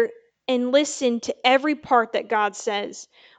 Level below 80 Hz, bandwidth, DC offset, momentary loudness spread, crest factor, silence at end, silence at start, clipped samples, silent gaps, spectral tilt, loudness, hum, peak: -68 dBFS; 9.4 kHz; under 0.1%; 10 LU; 20 dB; 0.35 s; 0 s; under 0.1%; none; -2.5 dB/octave; -22 LUFS; none; -4 dBFS